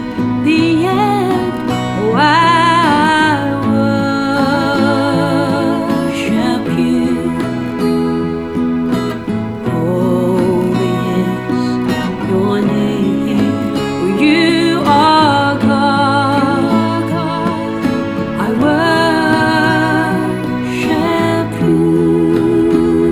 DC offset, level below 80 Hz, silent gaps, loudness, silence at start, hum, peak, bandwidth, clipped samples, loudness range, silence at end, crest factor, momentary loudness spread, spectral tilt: under 0.1%; -42 dBFS; none; -13 LUFS; 0 s; none; 0 dBFS; 15 kHz; under 0.1%; 4 LU; 0 s; 12 dB; 7 LU; -6.5 dB/octave